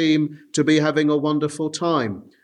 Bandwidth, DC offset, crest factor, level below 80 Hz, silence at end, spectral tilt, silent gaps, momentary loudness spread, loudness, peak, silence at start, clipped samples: 11 kHz; under 0.1%; 14 dB; -68 dBFS; 0.25 s; -5.5 dB/octave; none; 7 LU; -21 LUFS; -6 dBFS; 0 s; under 0.1%